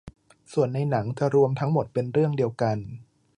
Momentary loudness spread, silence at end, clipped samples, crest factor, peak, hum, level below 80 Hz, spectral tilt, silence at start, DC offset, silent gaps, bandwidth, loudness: 10 LU; 0.35 s; under 0.1%; 16 dB; -8 dBFS; none; -58 dBFS; -8.5 dB/octave; 0.05 s; under 0.1%; none; 10.5 kHz; -25 LUFS